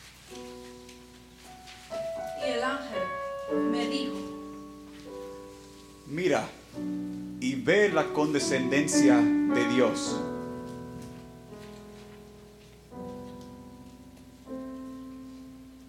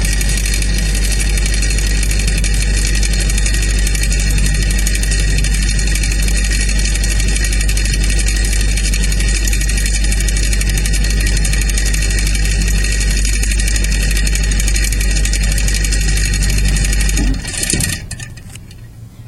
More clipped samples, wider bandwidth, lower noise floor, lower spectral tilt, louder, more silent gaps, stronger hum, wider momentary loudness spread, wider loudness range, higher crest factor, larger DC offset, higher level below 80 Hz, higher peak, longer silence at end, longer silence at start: neither; about the same, 14.5 kHz vs 13.5 kHz; first, -51 dBFS vs -33 dBFS; first, -4.5 dB/octave vs -3 dB/octave; second, -28 LUFS vs -15 LUFS; neither; neither; first, 24 LU vs 1 LU; first, 19 LU vs 0 LU; first, 22 dB vs 14 dB; neither; second, -60 dBFS vs -14 dBFS; second, -10 dBFS vs 0 dBFS; about the same, 0 s vs 0 s; about the same, 0 s vs 0 s